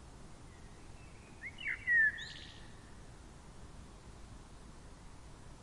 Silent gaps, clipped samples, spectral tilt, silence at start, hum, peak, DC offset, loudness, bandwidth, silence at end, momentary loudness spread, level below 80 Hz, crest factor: none; under 0.1%; -3 dB/octave; 0 s; none; -22 dBFS; under 0.1%; -33 LUFS; 11.5 kHz; 0 s; 26 LU; -56 dBFS; 20 dB